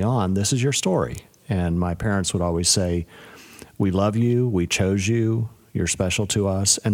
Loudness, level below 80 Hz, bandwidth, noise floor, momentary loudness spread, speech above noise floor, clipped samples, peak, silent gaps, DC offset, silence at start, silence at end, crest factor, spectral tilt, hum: -22 LUFS; -44 dBFS; 16.5 kHz; -44 dBFS; 8 LU; 23 dB; under 0.1%; -4 dBFS; none; under 0.1%; 0 s; 0 s; 18 dB; -4.5 dB/octave; none